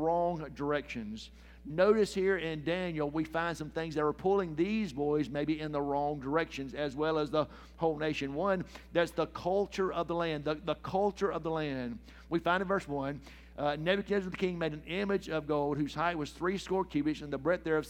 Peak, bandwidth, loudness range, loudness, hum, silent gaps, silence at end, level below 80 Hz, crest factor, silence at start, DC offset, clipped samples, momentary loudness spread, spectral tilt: -14 dBFS; 15.5 kHz; 2 LU; -33 LUFS; none; none; 0 s; -54 dBFS; 18 dB; 0 s; under 0.1%; under 0.1%; 7 LU; -6 dB/octave